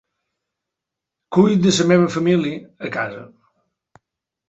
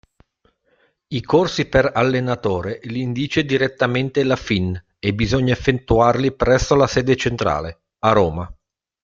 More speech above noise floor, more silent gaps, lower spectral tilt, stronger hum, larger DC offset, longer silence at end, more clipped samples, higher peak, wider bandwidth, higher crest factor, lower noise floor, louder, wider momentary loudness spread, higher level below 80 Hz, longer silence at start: first, 67 dB vs 45 dB; neither; about the same, -5.5 dB/octave vs -6 dB/octave; neither; neither; first, 1.2 s vs 0.5 s; neither; about the same, -2 dBFS vs -2 dBFS; first, 8.4 kHz vs 7.6 kHz; about the same, 18 dB vs 18 dB; first, -84 dBFS vs -63 dBFS; about the same, -18 LUFS vs -19 LUFS; first, 14 LU vs 9 LU; second, -58 dBFS vs -38 dBFS; first, 1.3 s vs 1.1 s